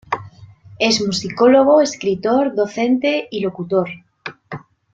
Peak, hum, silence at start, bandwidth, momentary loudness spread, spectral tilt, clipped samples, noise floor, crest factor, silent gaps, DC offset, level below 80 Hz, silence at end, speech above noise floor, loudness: -2 dBFS; none; 0.1 s; 9 kHz; 21 LU; -4.5 dB/octave; under 0.1%; -42 dBFS; 16 dB; none; under 0.1%; -58 dBFS; 0.35 s; 26 dB; -17 LUFS